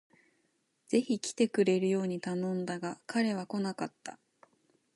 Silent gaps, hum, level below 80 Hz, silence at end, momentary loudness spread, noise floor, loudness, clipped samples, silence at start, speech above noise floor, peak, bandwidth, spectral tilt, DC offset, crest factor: none; none; -80 dBFS; 0.8 s; 11 LU; -76 dBFS; -32 LUFS; under 0.1%; 0.9 s; 44 dB; -14 dBFS; 11.5 kHz; -5.5 dB/octave; under 0.1%; 18 dB